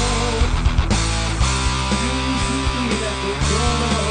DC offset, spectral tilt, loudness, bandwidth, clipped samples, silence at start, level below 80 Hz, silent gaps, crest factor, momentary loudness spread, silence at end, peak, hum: under 0.1%; -4 dB/octave; -20 LUFS; 10 kHz; under 0.1%; 0 s; -22 dBFS; none; 14 dB; 2 LU; 0 s; -4 dBFS; none